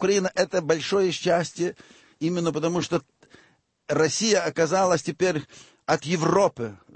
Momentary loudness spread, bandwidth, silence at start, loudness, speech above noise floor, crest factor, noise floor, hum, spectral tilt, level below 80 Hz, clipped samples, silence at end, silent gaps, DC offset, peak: 9 LU; 8.8 kHz; 0 s; -24 LUFS; 37 dB; 18 dB; -61 dBFS; none; -4.5 dB/octave; -62 dBFS; under 0.1%; 0.2 s; none; under 0.1%; -6 dBFS